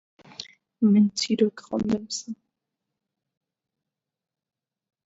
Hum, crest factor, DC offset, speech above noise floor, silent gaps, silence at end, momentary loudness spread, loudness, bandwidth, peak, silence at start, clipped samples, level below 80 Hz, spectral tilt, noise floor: none; 18 dB; under 0.1%; 63 dB; none; 2.7 s; 22 LU; -24 LUFS; 8 kHz; -10 dBFS; 0.4 s; under 0.1%; -64 dBFS; -5.5 dB/octave; -86 dBFS